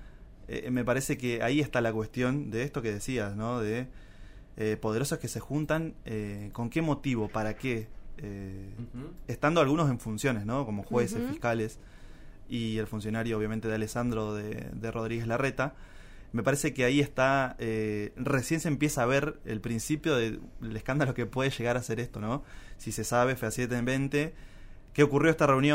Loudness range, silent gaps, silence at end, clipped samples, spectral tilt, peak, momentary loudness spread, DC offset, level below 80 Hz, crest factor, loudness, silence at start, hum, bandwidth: 4 LU; none; 0 s; under 0.1%; -5.5 dB/octave; -10 dBFS; 12 LU; under 0.1%; -48 dBFS; 22 dB; -30 LUFS; 0 s; none; 16 kHz